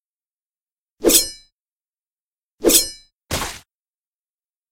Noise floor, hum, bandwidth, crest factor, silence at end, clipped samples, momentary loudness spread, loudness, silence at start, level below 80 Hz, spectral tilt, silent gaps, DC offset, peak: under -90 dBFS; none; 16.5 kHz; 24 dB; 1.15 s; under 0.1%; 13 LU; -17 LUFS; 1 s; -44 dBFS; -1.5 dB/octave; 1.52-1.80 s, 1.88-1.93 s, 2.00-2.05 s, 2.11-2.32 s, 2.43-2.58 s; under 0.1%; 0 dBFS